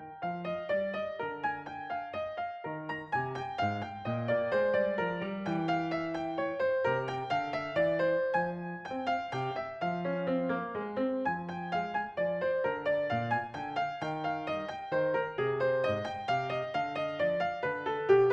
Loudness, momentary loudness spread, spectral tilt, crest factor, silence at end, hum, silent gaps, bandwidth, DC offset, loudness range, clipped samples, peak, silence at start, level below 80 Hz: -33 LUFS; 7 LU; -7 dB/octave; 20 dB; 0 s; none; none; 8 kHz; under 0.1%; 3 LU; under 0.1%; -12 dBFS; 0 s; -70 dBFS